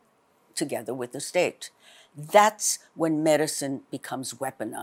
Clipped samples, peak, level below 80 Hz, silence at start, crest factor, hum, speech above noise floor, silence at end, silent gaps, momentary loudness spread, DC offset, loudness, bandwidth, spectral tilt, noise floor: under 0.1%; -6 dBFS; -84 dBFS; 0.55 s; 22 dB; none; 38 dB; 0 s; none; 15 LU; under 0.1%; -26 LUFS; 16.5 kHz; -3 dB/octave; -64 dBFS